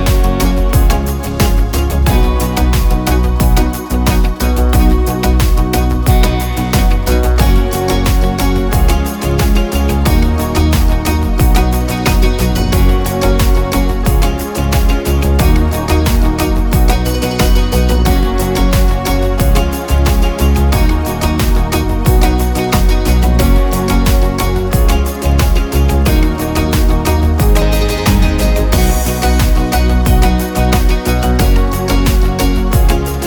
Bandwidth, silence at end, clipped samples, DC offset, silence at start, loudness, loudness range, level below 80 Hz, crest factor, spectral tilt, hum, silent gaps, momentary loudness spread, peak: over 20 kHz; 0 s; under 0.1%; under 0.1%; 0 s; -13 LUFS; 1 LU; -12 dBFS; 10 dB; -5.5 dB/octave; none; none; 3 LU; 0 dBFS